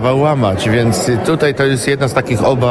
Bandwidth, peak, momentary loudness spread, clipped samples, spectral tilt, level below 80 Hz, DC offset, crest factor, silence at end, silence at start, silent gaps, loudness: 11 kHz; 0 dBFS; 2 LU; under 0.1%; -5.5 dB/octave; -40 dBFS; under 0.1%; 12 dB; 0 s; 0 s; none; -14 LUFS